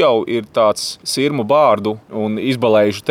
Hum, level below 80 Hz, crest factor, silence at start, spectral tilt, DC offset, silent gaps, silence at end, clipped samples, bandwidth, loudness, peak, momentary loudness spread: none; -62 dBFS; 14 dB; 0 s; -5 dB/octave; under 0.1%; none; 0 s; under 0.1%; 16 kHz; -16 LUFS; -2 dBFS; 8 LU